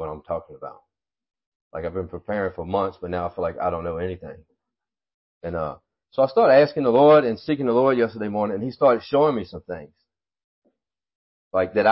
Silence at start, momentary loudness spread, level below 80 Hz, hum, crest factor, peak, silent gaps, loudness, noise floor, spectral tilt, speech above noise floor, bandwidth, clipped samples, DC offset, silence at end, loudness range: 0 s; 20 LU; -50 dBFS; none; 18 dB; -6 dBFS; 1.46-1.71 s, 5.14-5.41 s, 10.44-10.62 s, 11.15-11.51 s; -22 LUFS; -88 dBFS; -11 dB/octave; 66 dB; 5.8 kHz; under 0.1%; under 0.1%; 0 s; 11 LU